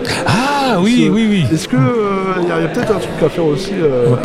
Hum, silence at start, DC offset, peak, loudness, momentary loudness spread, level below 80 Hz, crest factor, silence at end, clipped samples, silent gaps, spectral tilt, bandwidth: none; 0 s; under 0.1%; 0 dBFS; -14 LUFS; 5 LU; -38 dBFS; 14 dB; 0 s; under 0.1%; none; -6 dB/octave; 15 kHz